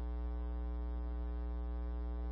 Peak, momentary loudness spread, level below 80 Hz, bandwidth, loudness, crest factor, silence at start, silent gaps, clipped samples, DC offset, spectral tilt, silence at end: -34 dBFS; 0 LU; -40 dBFS; 3.9 kHz; -42 LUFS; 6 dB; 0 s; none; under 0.1%; under 0.1%; -9 dB/octave; 0 s